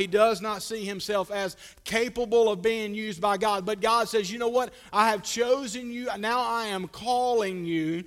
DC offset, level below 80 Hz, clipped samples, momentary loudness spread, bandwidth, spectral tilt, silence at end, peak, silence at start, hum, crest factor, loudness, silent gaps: under 0.1%; -60 dBFS; under 0.1%; 9 LU; 16 kHz; -3.5 dB/octave; 0.05 s; -8 dBFS; 0 s; none; 18 dB; -27 LUFS; none